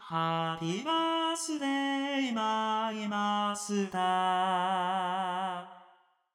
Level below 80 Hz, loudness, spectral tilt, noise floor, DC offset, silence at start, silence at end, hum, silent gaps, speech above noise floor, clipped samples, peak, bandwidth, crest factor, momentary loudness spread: -80 dBFS; -31 LUFS; -4 dB/octave; -64 dBFS; under 0.1%; 0 s; 0.5 s; none; none; 33 dB; under 0.1%; -18 dBFS; 15.5 kHz; 14 dB; 5 LU